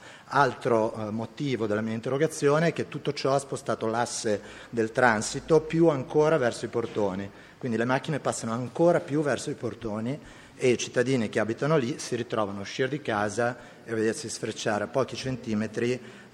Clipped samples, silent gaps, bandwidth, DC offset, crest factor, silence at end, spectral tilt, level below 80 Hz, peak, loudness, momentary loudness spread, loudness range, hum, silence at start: under 0.1%; none; 13 kHz; under 0.1%; 22 dB; 0.05 s; -5 dB/octave; -62 dBFS; -6 dBFS; -27 LUFS; 9 LU; 4 LU; none; 0 s